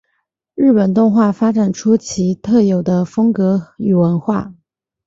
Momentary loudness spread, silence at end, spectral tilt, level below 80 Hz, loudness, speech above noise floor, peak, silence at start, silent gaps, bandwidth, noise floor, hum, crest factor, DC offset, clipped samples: 7 LU; 0.55 s; -7.5 dB/octave; -52 dBFS; -15 LUFS; 56 dB; -2 dBFS; 0.55 s; none; 7.8 kHz; -69 dBFS; none; 12 dB; under 0.1%; under 0.1%